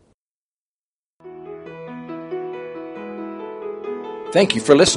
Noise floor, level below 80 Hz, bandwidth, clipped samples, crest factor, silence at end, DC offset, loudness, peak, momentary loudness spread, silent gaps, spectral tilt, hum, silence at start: under -90 dBFS; -56 dBFS; 10.5 kHz; under 0.1%; 22 dB; 0 s; under 0.1%; -22 LUFS; 0 dBFS; 20 LU; none; -3.5 dB/octave; none; 1.25 s